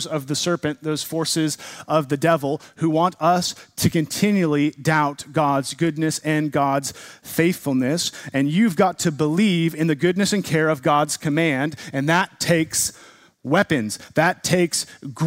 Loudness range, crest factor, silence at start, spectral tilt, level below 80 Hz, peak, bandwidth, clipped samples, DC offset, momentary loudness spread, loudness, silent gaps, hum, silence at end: 2 LU; 18 dB; 0 s; -4.5 dB/octave; -58 dBFS; -2 dBFS; 16 kHz; under 0.1%; under 0.1%; 6 LU; -21 LUFS; none; none; 0 s